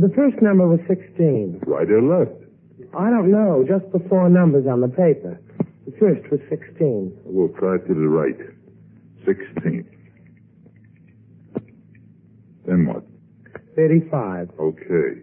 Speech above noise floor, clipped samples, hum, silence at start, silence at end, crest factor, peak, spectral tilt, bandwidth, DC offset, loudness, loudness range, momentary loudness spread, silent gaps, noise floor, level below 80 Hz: 32 dB; under 0.1%; none; 0 s; 0.05 s; 16 dB; -4 dBFS; -14.5 dB/octave; 3 kHz; under 0.1%; -19 LUFS; 12 LU; 13 LU; none; -50 dBFS; -62 dBFS